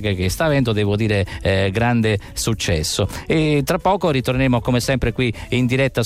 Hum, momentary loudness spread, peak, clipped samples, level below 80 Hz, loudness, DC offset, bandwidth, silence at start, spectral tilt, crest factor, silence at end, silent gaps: none; 3 LU; -6 dBFS; under 0.1%; -34 dBFS; -19 LUFS; under 0.1%; 16 kHz; 0 s; -5.5 dB/octave; 12 dB; 0 s; none